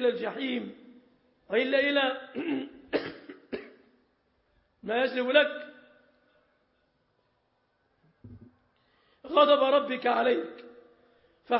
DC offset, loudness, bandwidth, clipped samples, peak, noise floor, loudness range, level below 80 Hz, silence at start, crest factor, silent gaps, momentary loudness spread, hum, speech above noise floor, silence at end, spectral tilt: under 0.1%; -27 LUFS; 5.8 kHz; under 0.1%; -8 dBFS; -73 dBFS; 6 LU; -72 dBFS; 0 s; 22 dB; none; 19 LU; none; 47 dB; 0 s; -7.5 dB/octave